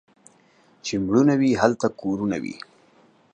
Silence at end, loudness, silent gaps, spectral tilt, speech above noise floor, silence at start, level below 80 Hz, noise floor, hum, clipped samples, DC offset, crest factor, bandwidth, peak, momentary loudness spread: 0.75 s; -22 LUFS; none; -6 dB/octave; 37 dB; 0.85 s; -56 dBFS; -58 dBFS; none; under 0.1%; under 0.1%; 22 dB; 9.2 kHz; -2 dBFS; 16 LU